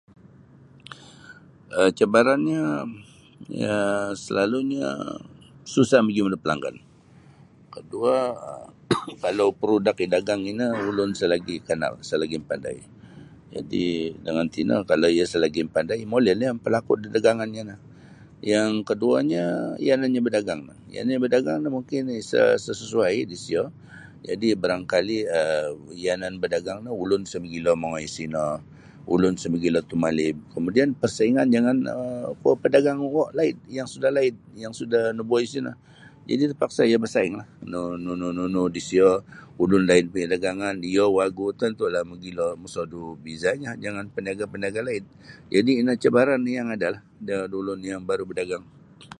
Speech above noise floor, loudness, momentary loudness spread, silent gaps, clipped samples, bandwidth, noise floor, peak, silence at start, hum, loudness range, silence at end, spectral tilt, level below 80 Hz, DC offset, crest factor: 28 dB; -24 LUFS; 13 LU; none; under 0.1%; 11.5 kHz; -52 dBFS; -4 dBFS; 0.9 s; none; 5 LU; 0.15 s; -5.5 dB/octave; -58 dBFS; under 0.1%; 20 dB